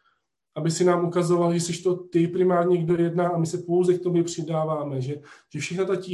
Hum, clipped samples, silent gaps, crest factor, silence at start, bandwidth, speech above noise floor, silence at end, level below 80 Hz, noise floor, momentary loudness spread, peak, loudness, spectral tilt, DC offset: none; under 0.1%; none; 16 dB; 0.55 s; 12 kHz; 47 dB; 0 s; -66 dBFS; -70 dBFS; 9 LU; -8 dBFS; -24 LUFS; -6.5 dB/octave; under 0.1%